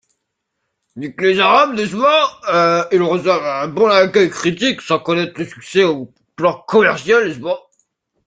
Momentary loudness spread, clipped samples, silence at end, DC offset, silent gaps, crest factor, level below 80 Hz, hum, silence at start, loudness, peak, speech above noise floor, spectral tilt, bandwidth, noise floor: 12 LU; under 0.1%; 0.7 s; under 0.1%; none; 16 dB; -60 dBFS; none; 0.95 s; -15 LUFS; 0 dBFS; 59 dB; -4.5 dB/octave; 9.2 kHz; -74 dBFS